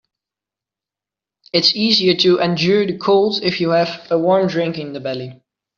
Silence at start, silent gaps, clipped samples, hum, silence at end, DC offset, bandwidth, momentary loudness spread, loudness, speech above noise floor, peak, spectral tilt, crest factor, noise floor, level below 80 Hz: 1.55 s; none; under 0.1%; none; 0.45 s; under 0.1%; 7.2 kHz; 12 LU; -16 LUFS; 72 dB; -2 dBFS; -3.5 dB/octave; 16 dB; -88 dBFS; -60 dBFS